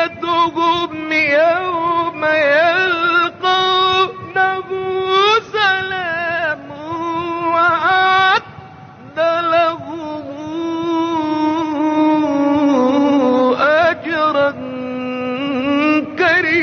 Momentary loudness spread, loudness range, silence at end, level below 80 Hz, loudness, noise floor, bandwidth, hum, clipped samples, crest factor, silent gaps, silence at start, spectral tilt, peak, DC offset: 10 LU; 3 LU; 0 s; -56 dBFS; -15 LUFS; -37 dBFS; 6.8 kHz; none; under 0.1%; 12 dB; none; 0 s; -1.5 dB/octave; -4 dBFS; under 0.1%